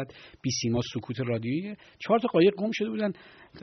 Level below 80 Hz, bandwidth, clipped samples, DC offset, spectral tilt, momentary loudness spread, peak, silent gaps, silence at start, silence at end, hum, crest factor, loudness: -62 dBFS; 6.4 kHz; under 0.1%; under 0.1%; -5.5 dB/octave; 16 LU; -10 dBFS; none; 0 s; 0 s; none; 18 dB; -28 LUFS